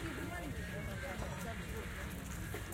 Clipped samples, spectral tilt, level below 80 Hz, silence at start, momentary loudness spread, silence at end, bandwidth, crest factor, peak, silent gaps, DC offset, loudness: under 0.1%; -5 dB/octave; -48 dBFS; 0 s; 2 LU; 0 s; 16.5 kHz; 16 dB; -28 dBFS; none; under 0.1%; -43 LUFS